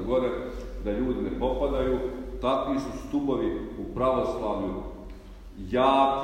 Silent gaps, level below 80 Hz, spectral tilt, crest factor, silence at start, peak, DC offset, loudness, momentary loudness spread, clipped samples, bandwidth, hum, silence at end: none; -40 dBFS; -7 dB/octave; 18 dB; 0 s; -8 dBFS; under 0.1%; -28 LUFS; 14 LU; under 0.1%; 15 kHz; none; 0 s